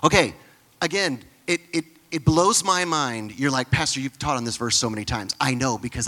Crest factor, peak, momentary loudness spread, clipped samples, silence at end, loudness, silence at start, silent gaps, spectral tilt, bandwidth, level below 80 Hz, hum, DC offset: 22 dB; 0 dBFS; 9 LU; under 0.1%; 0 s; -23 LUFS; 0 s; none; -3.5 dB/octave; 17.5 kHz; -46 dBFS; none; under 0.1%